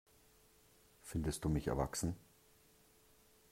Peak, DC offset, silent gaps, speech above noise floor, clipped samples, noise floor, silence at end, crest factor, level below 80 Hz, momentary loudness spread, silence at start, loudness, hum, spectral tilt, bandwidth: -22 dBFS; under 0.1%; none; 30 dB; under 0.1%; -68 dBFS; 1.35 s; 22 dB; -54 dBFS; 13 LU; 1.05 s; -40 LUFS; none; -5.5 dB/octave; 16 kHz